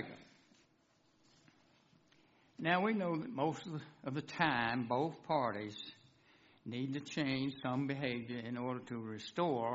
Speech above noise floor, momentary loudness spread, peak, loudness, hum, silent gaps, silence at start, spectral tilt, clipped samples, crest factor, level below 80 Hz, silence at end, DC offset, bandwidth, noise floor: 35 dB; 13 LU; -16 dBFS; -38 LUFS; none; none; 0 s; -4 dB/octave; under 0.1%; 24 dB; -76 dBFS; 0 s; under 0.1%; 7.6 kHz; -73 dBFS